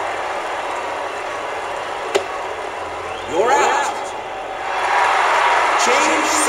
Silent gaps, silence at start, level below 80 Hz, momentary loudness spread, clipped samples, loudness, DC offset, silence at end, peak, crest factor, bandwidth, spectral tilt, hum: none; 0 s; -54 dBFS; 12 LU; under 0.1%; -19 LUFS; under 0.1%; 0 s; 0 dBFS; 18 dB; 16 kHz; -1 dB/octave; none